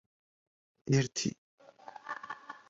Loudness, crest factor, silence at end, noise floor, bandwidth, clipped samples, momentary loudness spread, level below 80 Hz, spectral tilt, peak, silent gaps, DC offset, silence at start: -34 LUFS; 22 dB; 0.1 s; -52 dBFS; 7.8 kHz; under 0.1%; 23 LU; -70 dBFS; -5 dB/octave; -16 dBFS; 1.38-1.58 s; under 0.1%; 0.85 s